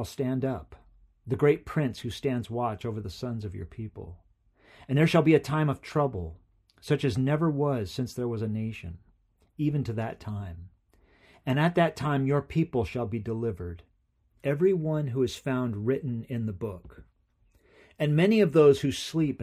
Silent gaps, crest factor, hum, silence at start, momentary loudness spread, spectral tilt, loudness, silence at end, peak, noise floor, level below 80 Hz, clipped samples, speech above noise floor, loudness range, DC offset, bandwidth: none; 20 dB; none; 0 s; 17 LU; -7 dB/octave; -28 LUFS; 0 s; -8 dBFS; -69 dBFS; -54 dBFS; under 0.1%; 42 dB; 6 LU; under 0.1%; 14 kHz